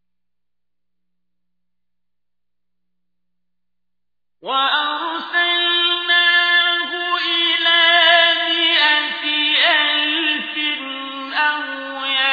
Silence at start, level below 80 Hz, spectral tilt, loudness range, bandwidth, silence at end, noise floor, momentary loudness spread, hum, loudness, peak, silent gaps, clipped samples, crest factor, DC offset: 4.45 s; -74 dBFS; -1.5 dB/octave; 10 LU; 5 kHz; 0 s; -87 dBFS; 12 LU; 60 Hz at -80 dBFS; -15 LUFS; -2 dBFS; none; under 0.1%; 18 dB; under 0.1%